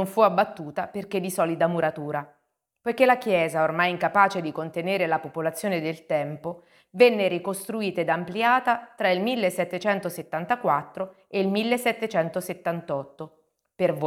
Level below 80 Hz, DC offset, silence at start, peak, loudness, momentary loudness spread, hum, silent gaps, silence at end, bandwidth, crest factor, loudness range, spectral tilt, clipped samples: -72 dBFS; under 0.1%; 0 s; -4 dBFS; -25 LUFS; 12 LU; none; none; 0 s; 17.5 kHz; 22 dB; 3 LU; -5 dB/octave; under 0.1%